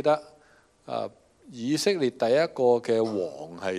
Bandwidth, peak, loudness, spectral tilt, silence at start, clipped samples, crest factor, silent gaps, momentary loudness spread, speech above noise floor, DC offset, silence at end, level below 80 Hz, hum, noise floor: 13.5 kHz; -10 dBFS; -26 LUFS; -5 dB/octave; 0 s; under 0.1%; 18 dB; none; 13 LU; 34 dB; under 0.1%; 0 s; -72 dBFS; none; -60 dBFS